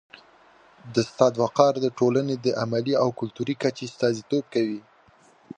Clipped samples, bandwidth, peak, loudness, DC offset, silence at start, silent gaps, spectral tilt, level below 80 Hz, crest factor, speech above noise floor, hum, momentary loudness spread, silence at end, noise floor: under 0.1%; 9.6 kHz; -2 dBFS; -24 LUFS; under 0.1%; 0.85 s; none; -6 dB/octave; -68 dBFS; 22 dB; 33 dB; none; 8 LU; 0.8 s; -57 dBFS